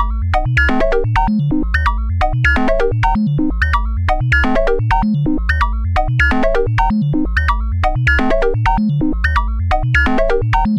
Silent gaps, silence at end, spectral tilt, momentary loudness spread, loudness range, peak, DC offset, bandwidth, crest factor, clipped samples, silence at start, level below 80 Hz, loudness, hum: none; 0 s; -7.5 dB/octave; 4 LU; 1 LU; -2 dBFS; under 0.1%; 9 kHz; 12 dB; under 0.1%; 0 s; -18 dBFS; -16 LUFS; none